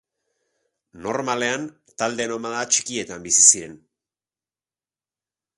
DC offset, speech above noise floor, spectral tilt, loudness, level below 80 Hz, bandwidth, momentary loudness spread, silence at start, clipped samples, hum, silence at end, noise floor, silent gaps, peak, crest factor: under 0.1%; over 68 dB; -1 dB/octave; -19 LUFS; -64 dBFS; 11.5 kHz; 16 LU; 0.95 s; under 0.1%; none; 1.8 s; under -90 dBFS; none; 0 dBFS; 26 dB